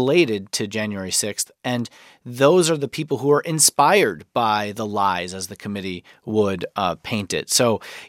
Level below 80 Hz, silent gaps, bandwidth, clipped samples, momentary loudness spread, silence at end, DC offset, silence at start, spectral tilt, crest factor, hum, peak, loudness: -62 dBFS; none; 16.5 kHz; under 0.1%; 13 LU; 0 s; under 0.1%; 0 s; -3.5 dB/octave; 20 dB; none; -2 dBFS; -20 LUFS